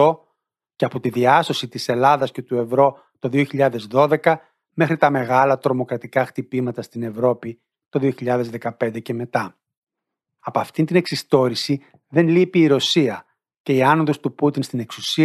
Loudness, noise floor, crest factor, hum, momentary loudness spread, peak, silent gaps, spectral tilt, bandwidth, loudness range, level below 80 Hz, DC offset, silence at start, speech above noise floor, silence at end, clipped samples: -20 LUFS; -82 dBFS; 18 dB; none; 11 LU; -2 dBFS; 9.77-9.87 s, 13.60-13.64 s; -6 dB/octave; 14 kHz; 6 LU; -68 dBFS; under 0.1%; 0 s; 63 dB; 0 s; under 0.1%